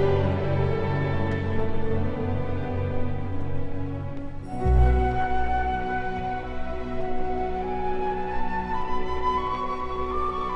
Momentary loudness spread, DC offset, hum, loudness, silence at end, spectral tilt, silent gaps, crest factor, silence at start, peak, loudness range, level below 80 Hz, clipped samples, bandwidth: 8 LU; under 0.1%; none; -28 LUFS; 0 s; -8.5 dB/octave; none; 14 dB; 0 s; -10 dBFS; 3 LU; -30 dBFS; under 0.1%; 5.8 kHz